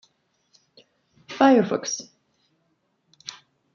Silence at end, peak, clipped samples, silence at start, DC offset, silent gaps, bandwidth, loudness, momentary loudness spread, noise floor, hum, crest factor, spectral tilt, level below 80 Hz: 1.75 s; -4 dBFS; under 0.1%; 1.3 s; under 0.1%; none; 7.4 kHz; -21 LUFS; 23 LU; -71 dBFS; none; 22 dB; -4 dB/octave; -74 dBFS